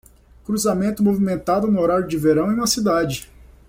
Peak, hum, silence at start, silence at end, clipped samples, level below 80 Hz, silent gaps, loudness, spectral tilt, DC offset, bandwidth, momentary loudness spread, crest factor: -6 dBFS; none; 0.5 s; 0.45 s; under 0.1%; -46 dBFS; none; -19 LUFS; -5 dB/octave; under 0.1%; 16.5 kHz; 7 LU; 14 dB